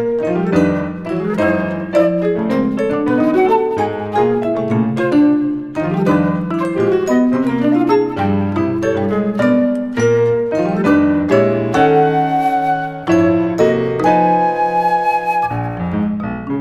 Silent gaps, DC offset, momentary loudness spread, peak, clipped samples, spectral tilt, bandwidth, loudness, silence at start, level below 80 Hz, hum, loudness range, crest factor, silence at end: none; under 0.1%; 6 LU; -2 dBFS; under 0.1%; -7.5 dB/octave; 12.5 kHz; -15 LUFS; 0 s; -46 dBFS; none; 2 LU; 14 dB; 0 s